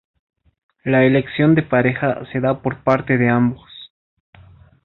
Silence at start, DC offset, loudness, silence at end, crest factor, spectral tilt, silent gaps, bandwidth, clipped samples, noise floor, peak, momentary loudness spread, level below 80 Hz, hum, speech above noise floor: 0.85 s; under 0.1%; -17 LUFS; 1 s; 18 dB; -9.5 dB/octave; none; 5.4 kHz; under 0.1%; -46 dBFS; -2 dBFS; 13 LU; -50 dBFS; none; 30 dB